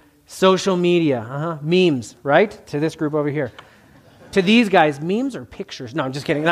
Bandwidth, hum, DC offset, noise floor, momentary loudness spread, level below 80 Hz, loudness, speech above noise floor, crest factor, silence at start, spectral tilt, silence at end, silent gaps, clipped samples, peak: 14.5 kHz; none; under 0.1%; -49 dBFS; 12 LU; -58 dBFS; -19 LUFS; 30 dB; 18 dB; 0.3 s; -6 dB/octave; 0 s; none; under 0.1%; -2 dBFS